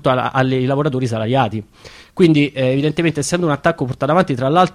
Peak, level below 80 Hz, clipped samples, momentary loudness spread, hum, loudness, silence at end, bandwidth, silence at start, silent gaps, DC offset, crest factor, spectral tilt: -2 dBFS; -48 dBFS; under 0.1%; 6 LU; none; -17 LUFS; 0.05 s; 13 kHz; 0.05 s; none; under 0.1%; 14 dB; -6 dB/octave